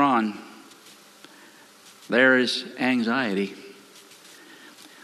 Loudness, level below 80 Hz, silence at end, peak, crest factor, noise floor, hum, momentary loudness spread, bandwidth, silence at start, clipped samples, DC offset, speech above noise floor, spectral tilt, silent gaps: -23 LUFS; -76 dBFS; 1.3 s; -6 dBFS; 20 dB; -51 dBFS; none; 27 LU; 13.5 kHz; 0 s; under 0.1%; under 0.1%; 28 dB; -4.5 dB/octave; none